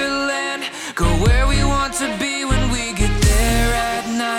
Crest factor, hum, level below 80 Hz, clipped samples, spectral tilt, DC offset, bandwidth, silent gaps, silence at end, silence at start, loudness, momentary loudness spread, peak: 12 dB; none; -22 dBFS; under 0.1%; -4 dB/octave; under 0.1%; 17.5 kHz; none; 0 s; 0 s; -19 LUFS; 5 LU; -6 dBFS